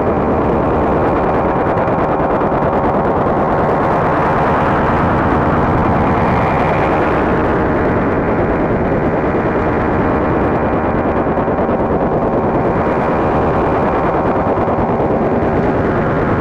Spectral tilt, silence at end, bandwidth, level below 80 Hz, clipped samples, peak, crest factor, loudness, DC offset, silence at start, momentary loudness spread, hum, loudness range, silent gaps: -9 dB/octave; 0 s; 8.8 kHz; -28 dBFS; under 0.1%; -2 dBFS; 12 dB; -14 LUFS; under 0.1%; 0 s; 2 LU; none; 1 LU; none